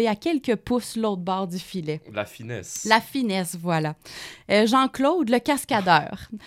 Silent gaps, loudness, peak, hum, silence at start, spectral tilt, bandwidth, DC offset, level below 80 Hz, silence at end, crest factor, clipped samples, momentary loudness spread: none; -23 LUFS; 0 dBFS; none; 0 s; -4.5 dB/octave; 16.5 kHz; under 0.1%; -58 dBFS; 0 s; 24 dB; under 0.1%; 13 LU